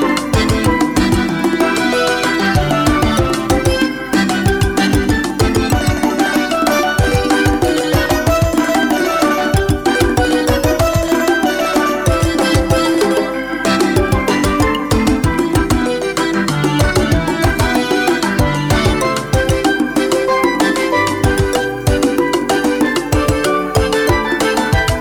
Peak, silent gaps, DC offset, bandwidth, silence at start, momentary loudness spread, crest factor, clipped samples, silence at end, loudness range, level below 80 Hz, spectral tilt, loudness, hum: -4 dBFS; none; under 0.1%; over 20 kHz; 0 s; 2 LU; 10 dB; under 0.1%; 0 s; 1 LU; -26 dBFS; -5 dB/octave; -14 LUFS; none